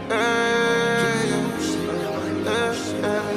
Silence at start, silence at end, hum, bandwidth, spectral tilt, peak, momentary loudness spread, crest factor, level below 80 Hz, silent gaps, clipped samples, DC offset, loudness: 0 s; 0 s; none; 16 kHz; -4.5 dB/octave; -8 dBFS; 6 LU; 16 dB; -54 dBFS; none; under 0.1%; under 0.1%; -22 LUFS